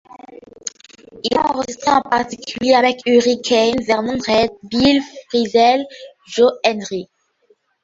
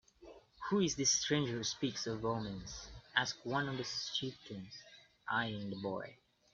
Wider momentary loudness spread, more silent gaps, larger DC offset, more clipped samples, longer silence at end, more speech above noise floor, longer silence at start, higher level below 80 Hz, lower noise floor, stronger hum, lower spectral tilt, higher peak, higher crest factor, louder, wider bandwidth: second, 13 LU vs 17 LU; neither; neither; neither; first, 0.8 s vs 0.4 s; first, 43 dB vs 21 dB; about the same, 0.1 s vs 0.2 s; first, -50 dBFS vs -66 dBFS; about the same, -59 dBFS vs -59 dBFS; neither; about the same, -3.5 dB/octave vs -3 dB/octave; first, 0 dBFS vs -14 dBFS; second, 18 dB vs 24 dB; first, -17 LUFS vs -37 LUFS; about the same, 7.8 kHz vs 7.8 kHz